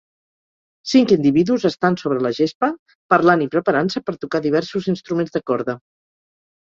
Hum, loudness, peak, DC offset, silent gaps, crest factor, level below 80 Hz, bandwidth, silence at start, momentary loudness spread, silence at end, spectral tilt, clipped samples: none; -19 LUFS; -2 dBFS; under 0.1%; 2.55-2.61 s, 2.79-2.86 s, 2.95-3.09 s; 18 dB; -60 dBFS; 7.6 kHz; 0.85 s; 9 LU; 1 s; -6.5 dB/octave; under 0.1%